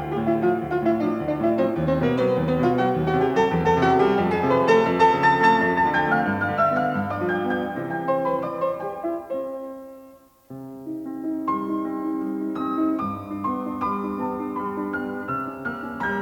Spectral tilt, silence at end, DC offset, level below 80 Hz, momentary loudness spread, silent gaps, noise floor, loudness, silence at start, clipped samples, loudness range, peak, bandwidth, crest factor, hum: -7.5 dB/octave; 0 s; under 0.1%; -54 dBFS; 12 LU; none; -49 dBFS; -23 LUFS; 0 s; under 0.1%; 11 LU; -6 dBFS; 18.5 kHz; 16 dB; none